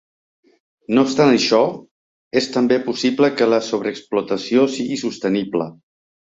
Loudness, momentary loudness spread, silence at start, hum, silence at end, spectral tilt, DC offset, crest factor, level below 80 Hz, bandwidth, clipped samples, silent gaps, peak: -18 LUFS; 9 LU; 0.9 s; none; 0.55 s; -5 dB/octave; under 0.1%; 16 dB; -62 dBFS; 8 kHz; under 0.1%; 1.91-2.31 s; -2 dBFS